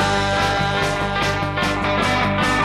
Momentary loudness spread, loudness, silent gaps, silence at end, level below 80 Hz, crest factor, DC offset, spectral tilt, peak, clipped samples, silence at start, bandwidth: 2 LU; -19 LUFS; none; 0 s; -34 dBFS; 14 dB; under 0.1%; -4.5 dB/octave; -6 dBFS; under 0.1%; 0 s; 15 kHz